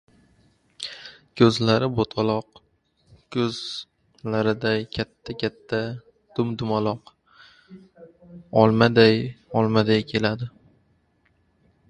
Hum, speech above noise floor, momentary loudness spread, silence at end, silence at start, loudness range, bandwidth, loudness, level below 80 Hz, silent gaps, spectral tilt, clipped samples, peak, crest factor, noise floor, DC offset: none; 43 dB; 18 LU; 1.4 s; 0.8 s; 7 LU; 10.5 kHz; -23 LUFS; -56 dBFS; none; -6.5 dB/octave; under 0.1%; 0 dBFS; 24 dB; -65 dBFS; under 0.1%